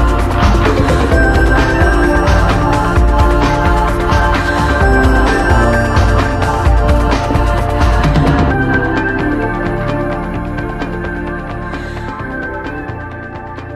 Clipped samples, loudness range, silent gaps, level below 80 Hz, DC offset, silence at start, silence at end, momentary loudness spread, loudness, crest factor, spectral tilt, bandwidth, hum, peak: under 0.1%; 8 LU; none; -16 dBFS; under 0.1%; 0 s; 0 s; 11 LU; -13 LUFS; 12 dB; -6.5 dB/octave; 12.5 kHz; none; 0 dBFS